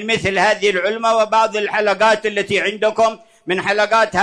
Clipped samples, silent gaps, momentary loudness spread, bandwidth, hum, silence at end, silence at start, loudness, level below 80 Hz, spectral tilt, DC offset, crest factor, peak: under 0.1%; none; 4 LU; 10.5 kHz; none; 0 s; 0 s; -16 LUFS; -54 dBFS; -3.5 dB/octave; under 0.1%; 12 dB; -4 dBFS